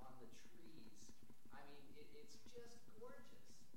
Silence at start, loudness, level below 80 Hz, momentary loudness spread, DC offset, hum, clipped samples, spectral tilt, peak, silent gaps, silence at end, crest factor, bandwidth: 0 s; -64 LUFS; -80 dBFS; 4 LU; 0.3%; none; under 0.1%; -4 dB/octave; -44 dBFS; none; 0 s; 16 dB; 16.5 kHz